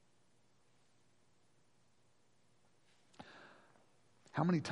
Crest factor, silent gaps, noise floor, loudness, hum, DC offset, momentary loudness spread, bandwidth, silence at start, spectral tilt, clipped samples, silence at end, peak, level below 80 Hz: 26 dB; none; -76 dBFS; -38 LUFS; none; under 0.1%; 24 LU; 11 kHz; 3.2 s; -7 dB/octave; under 0.1%; 0 s; -20 dBFS; -84 dBFS